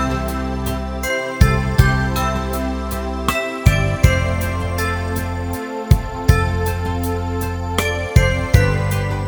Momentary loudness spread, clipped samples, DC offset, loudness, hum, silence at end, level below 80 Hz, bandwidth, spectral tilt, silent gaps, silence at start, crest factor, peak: 7 LU; under 0.1%; under 0.1%; -19 LUFS; none; 0 s; -24 dBFS; over 20 kHz; -6 dB/octave; none; 0 s; 18 dB; 0 dBFS